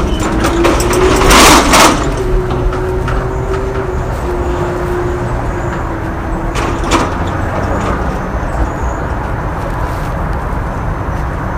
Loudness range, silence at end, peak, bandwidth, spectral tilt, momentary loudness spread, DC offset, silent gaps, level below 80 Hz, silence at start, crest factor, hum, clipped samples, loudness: 8 LU; 0 s; 0 dBFS; over 20 kHz; -4.5 dB/octave; 12 LU; under 0.1%; none; -18 dBFS; 0 s; 12 dB; none; 0.5%; -13 LUFS